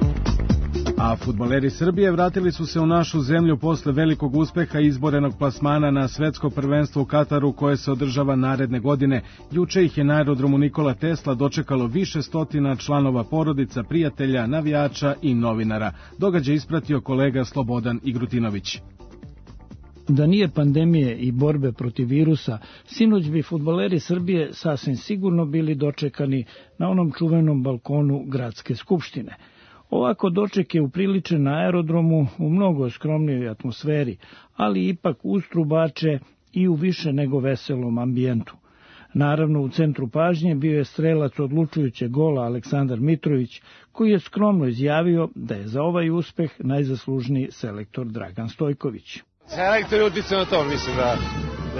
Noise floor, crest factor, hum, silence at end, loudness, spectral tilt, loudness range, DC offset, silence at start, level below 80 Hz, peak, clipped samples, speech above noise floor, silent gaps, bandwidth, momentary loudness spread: -50 dBFS; 14 dB; none; 0 s; -22 LUFS; -7.5 dB/octave; 3 LU; under 0.1%; 0 s; -40 dBFS; -8 dBFS; under 0.1%; 29 dB; none; 6.6 kHz; 8 LU